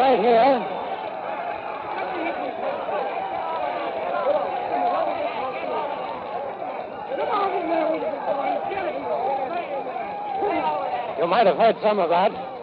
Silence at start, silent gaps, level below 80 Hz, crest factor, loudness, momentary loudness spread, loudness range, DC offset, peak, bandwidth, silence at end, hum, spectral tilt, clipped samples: 0 s; none; -64 dBFS; 16 dB; -24 LUFS; 11 LU; 4 LU; under 0.1%; -8 dBFS; 5.2 kHz; 0 s; none; -8.5 dB/octave; under 0.1%